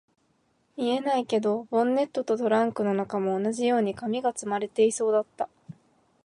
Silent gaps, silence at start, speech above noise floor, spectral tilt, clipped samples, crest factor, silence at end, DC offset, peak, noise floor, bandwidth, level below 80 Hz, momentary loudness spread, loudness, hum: none; 0.75 s; 44 dB; -5 dB/octave; under 0.1%; 16 dB; 0.55 s; under 0.1%; -10 dBFS; -69 dBFS; 11.5 kHz; -72 dBFS; 6 LU; -26 LUFS; none